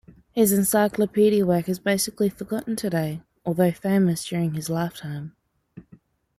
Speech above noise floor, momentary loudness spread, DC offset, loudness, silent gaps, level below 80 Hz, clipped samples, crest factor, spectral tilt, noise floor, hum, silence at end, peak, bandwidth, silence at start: 32 dB; 12 LU; under 0.1%; -23 LUFS; none; -58 dBFS; under 0.1%; 16 dB; -5.5 dB/octave; -55 dBFS; none; 0.55 s; -8 dBFS; 16 kHz; 0.35 s